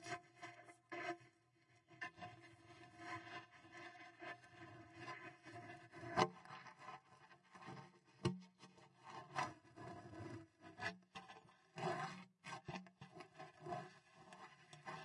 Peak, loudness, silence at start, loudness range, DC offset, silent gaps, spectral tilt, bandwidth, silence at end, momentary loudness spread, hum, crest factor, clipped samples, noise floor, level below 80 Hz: -18 dBFS; -51 LUFS; 0 s; 8 LU; under 0.1%; none; -5 dB/octave; 11 kHz; 0 s; 17 LU; none; 34 dB; under 0.1%; -75 dBFS; -82 dBFS